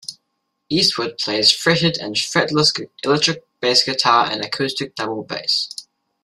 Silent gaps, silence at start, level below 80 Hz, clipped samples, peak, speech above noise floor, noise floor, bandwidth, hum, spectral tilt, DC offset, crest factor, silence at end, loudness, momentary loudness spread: none; 0.1 s; -58 dBFS; under 0.1%; 0 dBFS; 55 dB; -73 dBFS; 14.5 kHz; none; -3 dB/octave; under 0.1%; 20 dB; 0.4 s; -17 LUFS; 10 LU